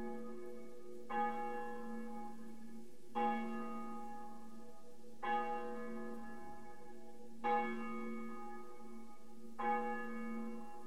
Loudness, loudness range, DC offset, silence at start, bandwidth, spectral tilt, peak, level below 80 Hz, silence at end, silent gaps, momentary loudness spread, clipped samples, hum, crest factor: -44 LUFS; 3 LU; 0.6%; 0 s; 15.5 kHz; -5.5 dB/octave; -24 dBFS; -80 dBFS; 0 s; none; 18 LU; under 0.1%; none; 20 dB